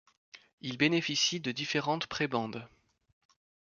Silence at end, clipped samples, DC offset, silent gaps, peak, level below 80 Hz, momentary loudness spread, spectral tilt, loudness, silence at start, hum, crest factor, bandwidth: 1.1 s; under 0.1%; under 0.1%; 0.53-0.58 s; -12 dBFS; -72 dBFS; 14 LU; -3.5 dB/octave; -31 LUFS; 0.35 s; none; 22 dB; 7.2 kHz